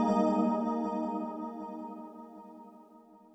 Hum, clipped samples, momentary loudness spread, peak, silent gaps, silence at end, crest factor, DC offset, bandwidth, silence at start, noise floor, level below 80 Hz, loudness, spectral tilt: none; under 0.1%; 23 LU; -16 dBFS; none; 0.15 s; 18 dB; under 0.1%; 8.6 kHz; 0 s; -57 dBFS; -74 dBFS; -33 LUFS; -8 dB/octave